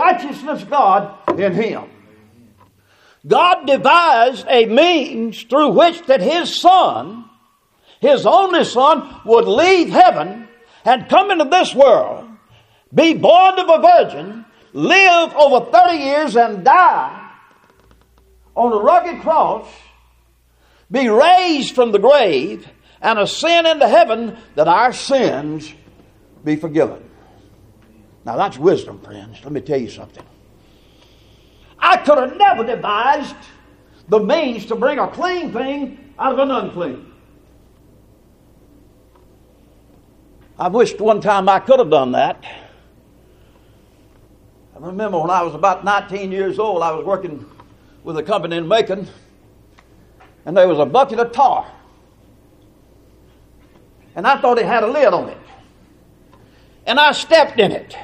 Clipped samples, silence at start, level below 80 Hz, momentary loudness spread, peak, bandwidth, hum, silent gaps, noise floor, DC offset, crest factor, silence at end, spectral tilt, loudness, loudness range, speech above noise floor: under 0.1%; 0 s; -54 dBFS; 16 LU; 0 dBFS; 9.8 kHz; none; none; -57 dBFS; under 0.1%; 16 dB; 0 s; -4.5 dB/octave; -14 LUFS; 10 LU; 43 dB